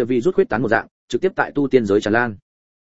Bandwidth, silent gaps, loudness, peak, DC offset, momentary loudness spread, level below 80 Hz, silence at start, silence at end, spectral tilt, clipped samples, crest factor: 8 kHz; 0.91-1.08 s; -19 LUFS; 0 dBFS; 0.9%; 6 LU; -52 dBFS; 0 s; 0.45 s; -6.5 dB/octave; under 0.1%; 18 dB